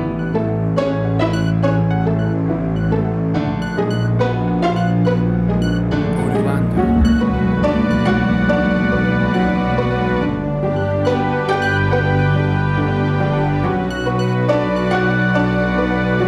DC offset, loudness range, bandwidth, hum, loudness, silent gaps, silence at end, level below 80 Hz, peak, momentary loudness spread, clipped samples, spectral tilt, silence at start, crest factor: under 0.1%; 2 LU; 11 kHz; none; -17 LUFS; none; 0 s; -30 dBFS; -4 dBFS; 3 LU; under 0.1%; -8 dB/octave; 0 s; 14 dB